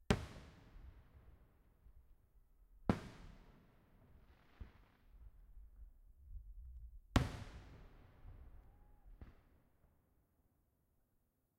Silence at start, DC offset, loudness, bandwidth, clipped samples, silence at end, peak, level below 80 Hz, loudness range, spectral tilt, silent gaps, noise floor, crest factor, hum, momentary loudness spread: 0 s; under 0.1%; -44 LUFS; 16 kHz; under 0.1%; 2.2 s; -14 dBFS; -56 dBFS; 18 LU; -6 dB/octave; none; -81 dBFS; 34 dB; none; 28 LU